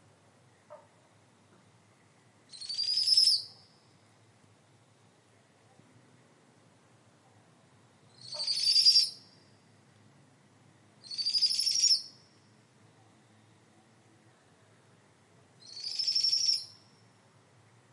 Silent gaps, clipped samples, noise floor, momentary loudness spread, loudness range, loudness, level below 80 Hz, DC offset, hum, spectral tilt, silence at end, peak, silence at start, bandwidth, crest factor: none; under 0.1%; -64 dBFS; 25 LU; 7 LU; -26 LUFS; under -90 dBFS; under 0.1%; none; 1.5 dB/octave; 1.25 s; -10 dBFS; 0.7 s; 11.5 kHz; 24 dB